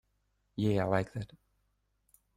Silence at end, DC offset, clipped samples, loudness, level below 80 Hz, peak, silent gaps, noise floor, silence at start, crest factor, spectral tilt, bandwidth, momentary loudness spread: 1.1 s; under 0.1%; under 0.1%; -33 LUFS; -62 dBFS; -14 dBFS; none; -77 dBFS; 0.55 s; 22 dB; -8 dB/octave; 14.5 kHz; 16 LU